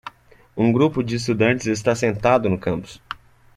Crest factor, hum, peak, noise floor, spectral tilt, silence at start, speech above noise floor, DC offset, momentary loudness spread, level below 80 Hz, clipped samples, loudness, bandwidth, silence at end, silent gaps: 18 dB; none; -4 dBFS; -44 dBFS; -6 dB/octave; 0.05 s; 25 dB; under 0.1%; 18 LU; -50 dBFS; under 0.1%; -20 LUFS; 12.5 kHz; 0.4 s; none